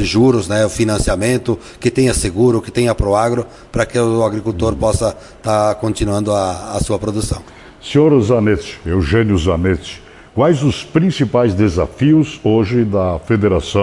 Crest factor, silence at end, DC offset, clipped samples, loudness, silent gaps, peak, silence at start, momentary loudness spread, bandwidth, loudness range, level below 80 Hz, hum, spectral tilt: 14 dB; 0 s; under 0.1%; under 0.1%; -15 LUFS; none; -2 dBFS; 0 s; 8 LU; 11.5 kHz; 2 LU; -32 dBFS; none; -6 dB/octave